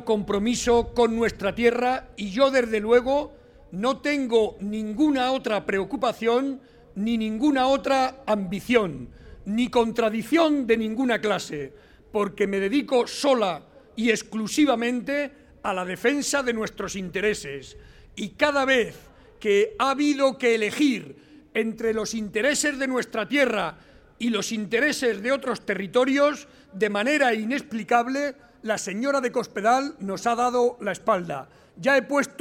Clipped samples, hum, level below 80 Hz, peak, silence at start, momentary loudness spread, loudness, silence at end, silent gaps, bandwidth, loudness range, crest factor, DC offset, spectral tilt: under 0.1%; none; -52 dBFS; -6 dBFS; 0 s; 10 LU; -24 LUFS; 0.1 s; none; 16.5 kHz; 2 LU; 18 dB; under 0.1%; -4 dB/octave